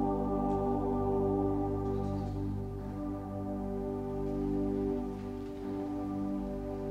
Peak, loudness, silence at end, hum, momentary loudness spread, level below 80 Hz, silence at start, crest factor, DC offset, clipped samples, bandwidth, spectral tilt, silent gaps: -20 dBFS; -35 LUFS; 0 s; 50 Hz at -45 dBFS; 8 LU; -44 dBFS; 0 s; 14 dB; under 0.1%; under 0.1%; 12 kHz; -10 dB/octave; none